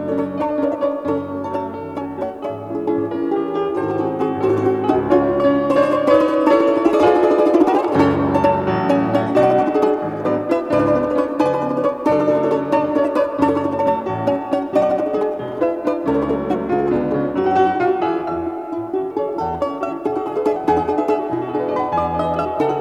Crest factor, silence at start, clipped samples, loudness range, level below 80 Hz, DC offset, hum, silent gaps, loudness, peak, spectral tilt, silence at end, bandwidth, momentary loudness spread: 16 dB; 0 s; under 0.1%; 6 LU; -50 dBFS; under 0.1%; none; none; -18 LUFS; 0 dBFS; -8 dB/octave; 0 s; 11 kHz; 8 LU